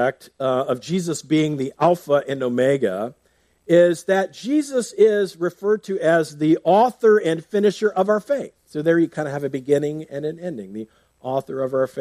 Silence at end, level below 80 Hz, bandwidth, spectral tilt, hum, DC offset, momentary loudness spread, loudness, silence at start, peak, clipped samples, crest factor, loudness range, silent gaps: 0 s; -68 dBFS; 14.5 kHz; -6 dB/octave; none; under 0.1%; 12 LU; -20 LUFS; 0 s; -4 dBFS; under 0.1%; 16 dB; 5 LU; none